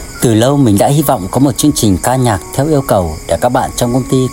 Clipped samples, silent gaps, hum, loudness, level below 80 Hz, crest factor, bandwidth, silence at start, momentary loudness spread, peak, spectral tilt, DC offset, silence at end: under 0.1%; none; none; -12 LUFS; -32 dBFS; 12 dB; 16.5 kHz; 0 s; 5 LU; 0 dBFS; -5.5 dB/octave; 0.3%; 0 s